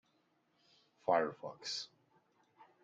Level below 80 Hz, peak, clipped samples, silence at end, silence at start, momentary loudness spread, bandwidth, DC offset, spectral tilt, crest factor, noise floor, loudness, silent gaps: -88 dBFS; -18 dBFS; under 0.1%; 0.2 s; 1.05 s; 12 LU; 9.2 kHz; under 0.1%; -3 dB/octave; 24 dB; -77 dBFS; -38 LUFS; none